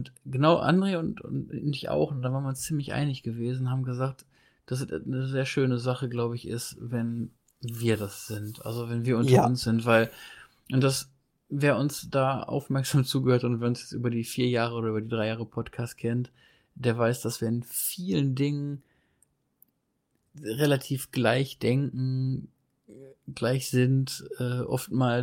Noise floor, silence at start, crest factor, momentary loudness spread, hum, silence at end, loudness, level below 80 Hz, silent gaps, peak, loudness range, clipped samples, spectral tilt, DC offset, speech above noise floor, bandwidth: -76 dBFS; 0 s; 20 dB; 11 LU; none; 0 s; -28 LUFS; -62 dBFS; none; -8 dBFS; 5 LU; under 0.1%; -6 dB/octave; under 0.1%; 48 dB; 17 kHz